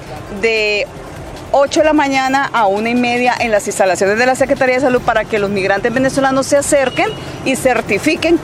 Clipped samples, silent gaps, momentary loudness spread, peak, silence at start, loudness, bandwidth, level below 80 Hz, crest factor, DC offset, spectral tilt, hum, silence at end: under 0.1%; none; 6 LU; 0 dBFS; 0 s; -14 LUFS; 15.5 kHz; -40 dBFS; 14 dB; under 0.1%; -4 dB/octave; none; 0 s